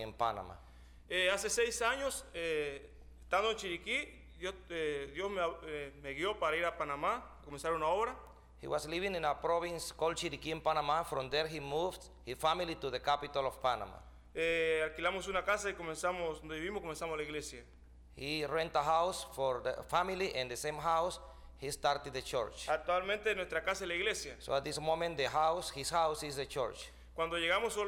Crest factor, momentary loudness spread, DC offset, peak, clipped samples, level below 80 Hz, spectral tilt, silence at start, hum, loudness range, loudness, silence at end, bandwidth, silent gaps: 18 dB; 11 LU; under 0.1%; -18 dBFS; under 0.1%; -58 dBFS; -3 dB/octave; 0 s; none; 3 LU; -36 LUFS; 0 s; 19.5 kHz; none